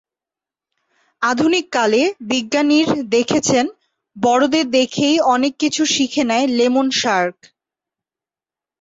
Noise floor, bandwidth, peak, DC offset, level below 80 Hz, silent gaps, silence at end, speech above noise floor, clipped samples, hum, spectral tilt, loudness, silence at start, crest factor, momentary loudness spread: -90 dBFS; 8 kHz; -4 dBFS; under 0.1%; -60 dBFS; none; 1.5 s; 74 dB; under 0.1%; none; -3 dB/octave; -16 LUFS; 1.2 s; 14 dB; 5 LU